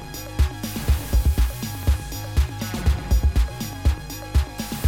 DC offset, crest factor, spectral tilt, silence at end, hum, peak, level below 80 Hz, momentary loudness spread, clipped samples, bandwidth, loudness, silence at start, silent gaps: under 0.1%; 14 dB; -5.5 dB/octave; 0 s; none; -8 dBFS; -24 dBFS; 5 LU; under 0.1%; 17 kHz; -24 LUFS; 0 s; none